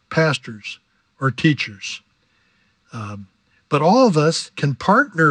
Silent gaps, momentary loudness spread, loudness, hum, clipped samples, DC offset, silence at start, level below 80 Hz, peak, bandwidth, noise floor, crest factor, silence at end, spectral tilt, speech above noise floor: none; 19 LU; -18 LUFS; none; under 0.1%; under 0.1%; 0.1 s; -62 dBFS; -2 dBFS; 10 kHz; -62 dBFS; 18 dB; 0 s; -5.5 dB/octave; 44 dB